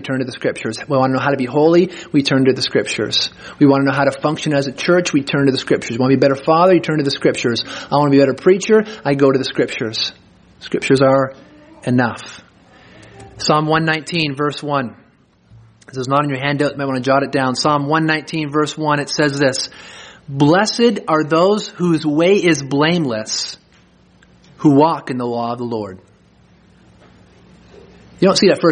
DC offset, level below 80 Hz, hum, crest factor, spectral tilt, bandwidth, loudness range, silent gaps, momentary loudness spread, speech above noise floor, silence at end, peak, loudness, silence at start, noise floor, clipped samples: under 0.1%; -56 dBFS; none; 16 dB; -5 dB/octave; 10 kHz; 5 LU; none; 10 LU; 37 dB; 0 s; 0 dBFS; -16 LUFS; 0 s; -52 dBFS; under 0.1%